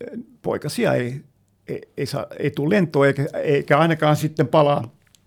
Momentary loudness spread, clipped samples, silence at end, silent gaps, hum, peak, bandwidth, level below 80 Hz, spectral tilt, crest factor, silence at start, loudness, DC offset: 16 LU; under 0.1%; 0.4 s; none; none; -2 dBFS; 17.5 kHz; -60 dBFS; -6.5 dB/octave; 18 dB; 0 s; -20 LUFS; under 0.1%